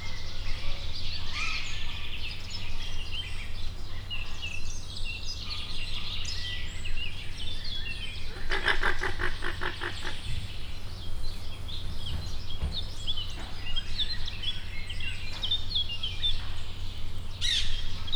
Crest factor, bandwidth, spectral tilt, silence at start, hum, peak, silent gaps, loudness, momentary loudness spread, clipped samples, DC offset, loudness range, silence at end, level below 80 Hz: 18 dB; 10 kHz; -3 dB/octave; 0 s; none; -10 dBFS; none; -34 LUFS; 11 LU; under 0.1%; under 0.1%; 5 LU; 0 s; -32 dBFS